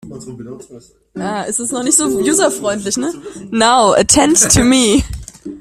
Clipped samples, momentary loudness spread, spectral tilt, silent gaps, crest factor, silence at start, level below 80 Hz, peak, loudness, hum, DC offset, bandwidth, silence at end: under 0.1%; 22 LU; -3 dB/octave; none; 14 dB; 0.05 s; -34 dBFS; 0 dBFS; -12 LUFS; none; under 0.1%; 16.5 kHz; 0 s